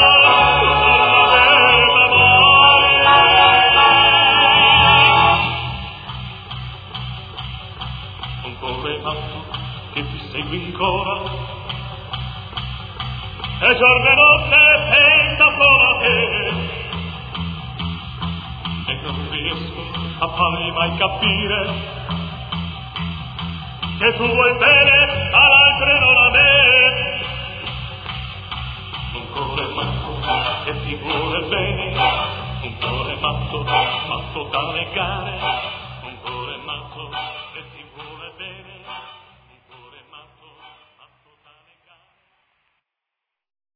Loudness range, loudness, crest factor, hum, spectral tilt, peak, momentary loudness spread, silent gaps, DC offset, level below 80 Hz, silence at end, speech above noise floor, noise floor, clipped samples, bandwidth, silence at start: 18 LU; -12 LUFS; 18 dB; none; -6.5 dB/octave; 0 dBFS; 20 LU; none; under 0.1%; -38 dBFS; 3.55 s; 67 dB; -83 dBFS; under 0.1%; 5 kHz; 0 s